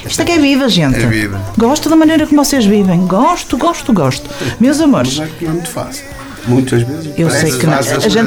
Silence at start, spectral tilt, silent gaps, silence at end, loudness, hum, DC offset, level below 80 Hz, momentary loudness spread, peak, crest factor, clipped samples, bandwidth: 0 s; -5 dB/octave; none; 0 s; -12 LUFS; none; under 0.1%; -34 dBFS; 9 LU; 0 dBFS; 10 dB; under 0.1%; 19.5 kHz